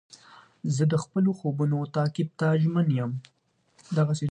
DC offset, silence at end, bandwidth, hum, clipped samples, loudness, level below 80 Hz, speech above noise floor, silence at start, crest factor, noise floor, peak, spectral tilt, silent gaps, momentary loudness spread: under 0.1%; 0 s; 9.4 kHz; none; under 0.1%; -26 LUFS; -68 dBFS; 38 dB; 0.65 s; 16 dB; -63 dBFS; -12 dBFS; -7.5 dB/octave; none; 7 LU